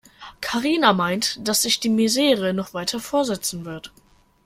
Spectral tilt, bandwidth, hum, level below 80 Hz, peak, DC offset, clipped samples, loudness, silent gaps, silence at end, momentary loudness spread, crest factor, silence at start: -3 dB/octave; 16.5 kHz; none; -56 dBFS; -2 dBFS; under 0.1%; under 0.1%; -21 LUFS; none; 0.6 s; 11 LU; 20 dB; 0.2 s